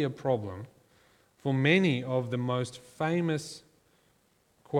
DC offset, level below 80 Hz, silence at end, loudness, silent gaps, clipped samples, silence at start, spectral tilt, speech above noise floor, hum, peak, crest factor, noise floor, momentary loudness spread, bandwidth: under 0.1%; -70 dBFS; 0 s; -29 LUFS; none; under 0.1%; 0 s; -6.5 dB/octave; 39 dB; none; -10 dBFS; 22 dB; -68 dBFS; 19 LU; 13 kHz